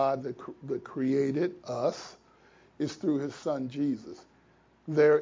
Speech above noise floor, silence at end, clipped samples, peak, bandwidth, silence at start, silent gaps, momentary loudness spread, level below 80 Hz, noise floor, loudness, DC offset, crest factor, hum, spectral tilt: 34 dB; 0 s; under 0.1%; -12 dBFS; 7.6 kHz; 0 s; none; 16 LU; -72 dBFS; -63 dBFS; -31 LUFS; under 0.1%; 18 dB; none; -7 dB/octave